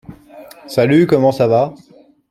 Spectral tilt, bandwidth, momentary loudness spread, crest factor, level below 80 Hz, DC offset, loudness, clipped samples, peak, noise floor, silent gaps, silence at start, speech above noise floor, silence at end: -7.5 dB/octave; 14.5 kHz; 9 LU; 14 dB; -54 dBFS; under 0.1%; -14 LUFS; under 0.1%; -2 dBFS; -39 dBFS; none; 0.1 s; 26 dB; 0.55 s